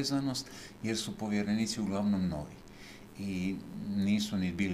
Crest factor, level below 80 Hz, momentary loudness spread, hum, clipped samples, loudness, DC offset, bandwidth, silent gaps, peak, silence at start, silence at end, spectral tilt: 16 dB; -58 dBFS; 16 LU; none; under 0.1%; -34 LUFS; under 0.1%; 15 kHz; none; -18 dBFS; 0 s; 0 s; -5 dB/octave